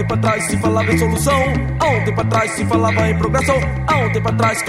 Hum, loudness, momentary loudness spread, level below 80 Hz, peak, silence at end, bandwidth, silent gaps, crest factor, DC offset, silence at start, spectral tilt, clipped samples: none; -16 LUFS; 2 LU; -30 dBFS; -2 dBFS; 0 s; 15.5 kHz; none; 14 dB; under 0.1%; 0 s; -5.5 dB/octave; under 0.1%